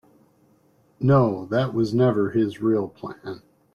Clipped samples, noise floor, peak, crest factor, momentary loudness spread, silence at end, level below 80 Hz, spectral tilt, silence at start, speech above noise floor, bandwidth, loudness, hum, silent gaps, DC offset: under 0.1%; -60 dBFS; -6 dBFS; 16 dB; 18 LU; 0.35 s; -60 dBFS; -9 dB/octave; 1 s; 39 dB; 7 kHz; -22 LUFS; none; none; under 0.1%